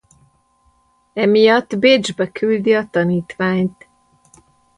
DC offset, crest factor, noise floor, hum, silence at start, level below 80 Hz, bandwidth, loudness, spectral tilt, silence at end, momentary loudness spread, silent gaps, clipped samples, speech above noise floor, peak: under 0.1%; 16 dB; -59 dBFS; none; 1.15 s; -58 dBFS; 10.5 kHz; -16 LUFS; -5.5 dB/octave; 1.05 s; 8 LU; none; under 0.1%; 43 dB; -2 dBFS